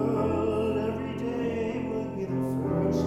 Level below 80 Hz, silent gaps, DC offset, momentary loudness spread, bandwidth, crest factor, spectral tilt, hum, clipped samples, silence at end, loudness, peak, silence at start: -50 dBFS; none; under 0.1%; 5 LU; 13.5 kHz; 14 dB; -8 dB/octave; none; under 0.1%; 0 s; -29 LUFS; -14 dBFS; 0 s